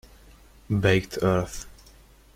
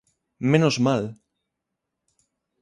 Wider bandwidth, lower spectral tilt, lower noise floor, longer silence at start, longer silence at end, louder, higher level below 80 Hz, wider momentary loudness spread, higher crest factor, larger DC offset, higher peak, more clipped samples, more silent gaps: first, 16 kHz vs 11 kHz; about the same, -6 dB/octave vs -6 dB/octave; second, -53 dBFS vs -82 dBFS; first, 0.7 s vs 0.4 s; second, 0.65 s vs 1.5 s; second, -25 LUFS vs -22 LUFS; first, -46 dBFS vs -64 dBFS; first, 17 LU vs 10 LU; about the same, 20 dB vs 20 dB; neither; about the same, -6 dBFS vs -6 dBFS; neither; neither